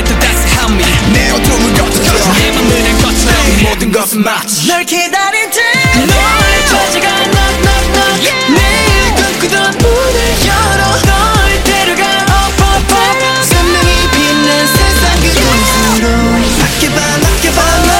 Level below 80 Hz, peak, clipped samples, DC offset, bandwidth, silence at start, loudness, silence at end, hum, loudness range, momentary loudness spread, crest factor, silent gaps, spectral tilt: -16 dBFS; 0 dBFS; under 0.1%; under 0.1%; 17 kHz; 0 s; -8 LUFS; 0 s; none; 1 LU; 2 LU; 8 dB; none; -3.5 dB/octave